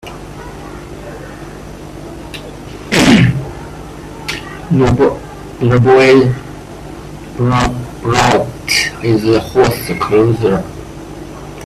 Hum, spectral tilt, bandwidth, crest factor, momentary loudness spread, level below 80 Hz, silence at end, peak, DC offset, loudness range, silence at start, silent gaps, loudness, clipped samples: none; -5.5 dB/octave; 15 kHz; 14 dB; 21 LU; -34 dBFS; 0 s; 0 dBFS; under 0.1%; 4 LU; 0.05 s; none; -12 LUFS; under 0.1%